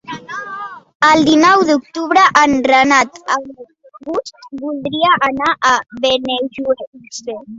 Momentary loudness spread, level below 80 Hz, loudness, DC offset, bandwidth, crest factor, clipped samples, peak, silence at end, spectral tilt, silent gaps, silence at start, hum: 17 LU; -52 dBFS; -13 LUFS; under 0.1%; 7.8 kHz; 14 dB; under 0.1%; 0 dBFS; 0 s; -3 dB/octave; 0.95-1.00 s, 6.87-6.93 s; 0.1 s; none